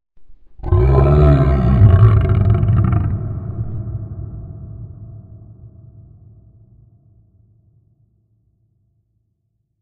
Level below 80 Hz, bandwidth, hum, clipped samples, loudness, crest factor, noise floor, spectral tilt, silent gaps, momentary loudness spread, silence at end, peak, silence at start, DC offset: -24 dBFS; 4.3 kHz; none; under 0.1%; -15 LUFS; 16 dB; -69 dBFS; -11 dB/octave; none; 22 LU; 4.15 s; 0 dBFS; 0.2 s; under 0.1%